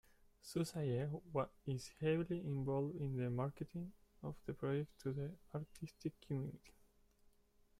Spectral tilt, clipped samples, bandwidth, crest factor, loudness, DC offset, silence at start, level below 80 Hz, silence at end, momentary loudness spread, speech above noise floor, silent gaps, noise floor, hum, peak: -7.5 dB/octave; under 0.1%; 15.5 kHz; 18 dB; -44 LUFS; under 0.1%; 0.45 s; -68 dBFS; 1.1 s; 10 LU; 30 dB; none; -73 dBFS; none; -26 dBFS